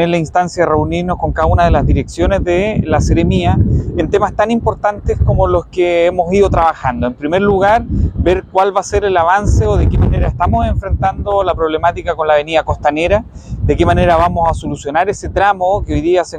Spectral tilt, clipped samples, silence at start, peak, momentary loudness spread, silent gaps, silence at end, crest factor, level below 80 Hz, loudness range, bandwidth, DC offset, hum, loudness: -7 dB/octave; under 0.1%; 0 s; 0 dBFS; 5 LU; none; 0 s; 12 dB; -22 dBFS; 1 LU; 9.6 kHz; under 0.1%; none; -14 LUFS